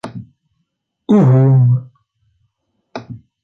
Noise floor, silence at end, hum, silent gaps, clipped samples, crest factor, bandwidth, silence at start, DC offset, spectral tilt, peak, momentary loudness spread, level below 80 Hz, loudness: -71 dBFS; 0.25 s; none; none; under 0.1%; 14 dB; 5.4 kHz; 0.05 s; under 0.1%; -10.5 dB/octave; -2 dBFS; 24 LU; -56 dBFS; -12 LUFS